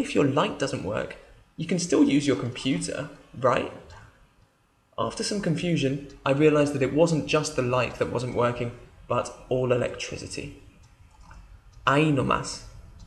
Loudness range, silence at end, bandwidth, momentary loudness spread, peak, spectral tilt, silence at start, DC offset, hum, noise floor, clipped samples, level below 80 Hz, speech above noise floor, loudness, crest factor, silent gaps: 5 LU; 0 s; 12 kHz; 14 LU; -6 dBFS; -5.5 dB/octave; 0 s; under 0.1%; none; -64 dBFS; under 0.1%; -52 dBFS; 39 dB; -26 LUFS; 20 dB; none